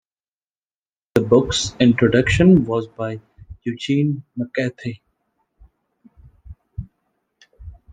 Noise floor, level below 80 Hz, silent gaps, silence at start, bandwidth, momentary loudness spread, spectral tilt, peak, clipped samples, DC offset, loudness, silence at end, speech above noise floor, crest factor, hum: under -90 dBFS; -42 dBFS; none; 1.15 s; 9.6 kHz; 21 LU; -6 dB/octave; -2 dBFS; under 0.1%; under 0.1%; -18 LUFS; 0.2 s; over 73 dB; 20 dB; none